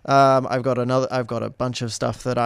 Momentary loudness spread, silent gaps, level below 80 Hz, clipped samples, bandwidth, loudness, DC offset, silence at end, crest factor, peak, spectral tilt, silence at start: 10 LU; none; -52 dBFS; under 0.1%; 13 kHz; -21 LUFS; under 0.1%; 0 s; 16 dB; -4 dBFS; -6 dB/octave; 0.05 s